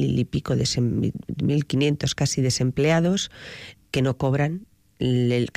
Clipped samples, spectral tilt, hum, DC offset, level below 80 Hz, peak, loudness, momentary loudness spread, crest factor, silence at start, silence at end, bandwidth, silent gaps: under 0.1%; -5.5 dB/octave; none; under 0.1%; -48 dBFS; -12 dBFS; -23 LUFS; 8 LU; 12 dB; 0 s; 0.05 s; 14.5 kHz; none